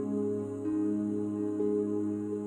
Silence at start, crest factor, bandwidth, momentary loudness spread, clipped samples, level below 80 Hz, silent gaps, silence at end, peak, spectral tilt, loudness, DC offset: 0 s; 12 dB; 9.6 kHz; 3 LU; under 0.1%; -72 dBFS; none; 0 s; -20 dBFS; -9.5 dB/octave; -32 LUFS; under 0.1%